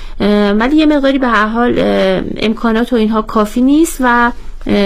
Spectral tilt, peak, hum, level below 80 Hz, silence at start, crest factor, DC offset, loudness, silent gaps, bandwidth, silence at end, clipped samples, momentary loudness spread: -5.5 dB/octave; 0 dBFS; none; -28 dBFS; 0 s; 12 dB; under 0.1%; -12 LUFS; none; 16 kHz; 0 s; under 0.1%; 5 LU